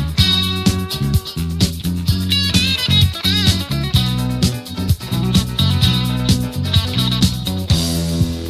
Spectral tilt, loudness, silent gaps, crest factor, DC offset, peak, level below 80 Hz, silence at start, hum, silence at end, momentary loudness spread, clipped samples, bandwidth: -4.5 dB/octave; -16 LUFS; none; 16 dB; under 0.1%; 0 dBFS; -26 dBFS; 0 s; none; 0 s; 6 LU; under 0.1%; 16 kHz